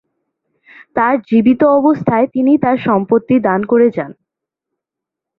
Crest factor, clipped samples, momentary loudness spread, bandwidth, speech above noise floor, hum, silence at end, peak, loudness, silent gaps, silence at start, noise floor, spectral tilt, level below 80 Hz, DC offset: 14 dB; under 0.1%; 5 LU; 4.2 kHz; 71 dB; none; 1.25 s; -2 dBFS; -13 LUFS; none; 0.95 s; -83 dBFS; -10 dB/octave; -54 dBFS; under 0.1%